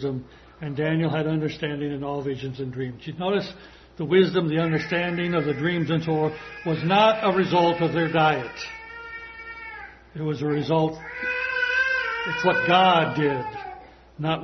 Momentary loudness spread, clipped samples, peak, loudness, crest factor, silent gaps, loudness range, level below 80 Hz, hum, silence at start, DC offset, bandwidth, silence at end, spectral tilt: 18 LU; under 0.1%; -4 dBFS; -23 LUFS; 20 dB; none; 6 LU; -56 dBFS; none; 0 s; under 0.1%; 6.4 kHz; 0 s; -7 dB/octave